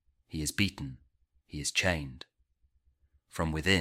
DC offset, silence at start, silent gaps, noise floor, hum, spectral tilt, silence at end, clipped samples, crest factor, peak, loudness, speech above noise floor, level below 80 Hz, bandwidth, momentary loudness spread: under 0.1%; 0.3 s; none; -71 dBFS; none; -3.5 dB/octave; 0 s; under 0.1%; 24 dB; -10 dBFS; -31 LUFS; 40 dB; -50 dBFS; 16 kHz; 17 LU